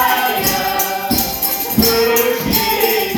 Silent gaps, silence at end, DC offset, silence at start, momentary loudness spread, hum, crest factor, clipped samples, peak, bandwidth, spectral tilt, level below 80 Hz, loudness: none; 0 s; under 0.1%; 0 s; 4 LU; none; 14 dB; under 0.1%; 0 dBFS; over 20 kHz; -3 dB/octave; -38 dBFS; -14 LUFS